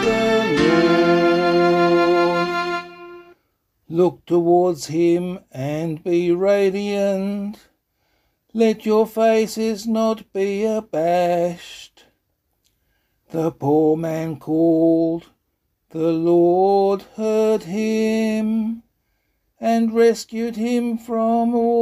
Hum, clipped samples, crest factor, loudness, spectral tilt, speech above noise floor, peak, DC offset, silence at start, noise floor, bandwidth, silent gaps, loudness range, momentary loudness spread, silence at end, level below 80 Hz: none; under 0.1%; 16 dB; -19 LUFS; -6 dB/octave; 53 dB; -4 dBFS; under 0.1%; 0 s; -71 dBFS; 14 kHz; none; 4 LU; 11 LU; 0 s; -56 dBFS